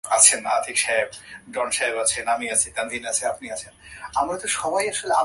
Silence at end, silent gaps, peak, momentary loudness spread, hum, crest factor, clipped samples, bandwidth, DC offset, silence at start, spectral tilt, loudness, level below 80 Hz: 0 s; none; 0 dBFS; 16 LU; none; 24 dB; under 0.1%; 12 kHz; under 0.1%; 0.05 s; 0 dB/octave; -21 LUFS; -56 dBFS